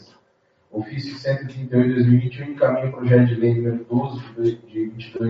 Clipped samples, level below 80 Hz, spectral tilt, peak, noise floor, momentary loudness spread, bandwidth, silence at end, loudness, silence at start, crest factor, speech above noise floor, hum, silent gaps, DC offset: under 0.1%; -60 dBFS; -8 dB/octave; -2 dBFS; -63 dBFS; 13 LU; 6 kHz; 0 s; -21 LUFS; 0.75 s; 18 dB; 43 dB; none; none; under 0.1%